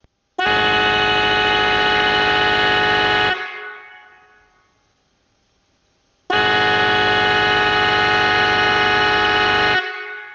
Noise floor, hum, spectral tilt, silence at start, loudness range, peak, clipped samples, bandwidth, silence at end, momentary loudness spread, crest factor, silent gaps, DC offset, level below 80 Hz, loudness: -63 dBFS; none; -3.5 dB/octave; 0.4 s; 9 LU; -4 dBFS; under 0.1%; 8.4 kHz; 0 s; 7 LU; 14 dB; none; under 0.1%; -44 dBFS; -15 LUFS